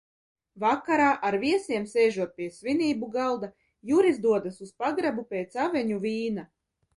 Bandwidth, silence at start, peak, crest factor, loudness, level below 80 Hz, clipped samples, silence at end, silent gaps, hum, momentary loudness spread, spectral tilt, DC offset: 11.5 kHz; 0.55 s; -10 dBFS; 16 dB; -27 LUFS; -68 dBFS; under 0.1%; 0.5 s; none; none; 11 LU; -5.5 dB/octave; under 0.1%